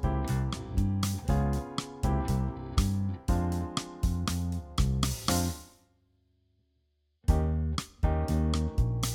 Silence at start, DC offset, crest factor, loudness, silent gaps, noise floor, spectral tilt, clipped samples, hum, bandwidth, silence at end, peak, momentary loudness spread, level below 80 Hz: 0 s; under 0.1%; 18 dB; -31 LUFS; none; -74 dBFS; -5.5 dB/octave; under 0.1%; none; 18.5 kHz; 0 s; -12 dBFS; 5 LU; -34 dBFS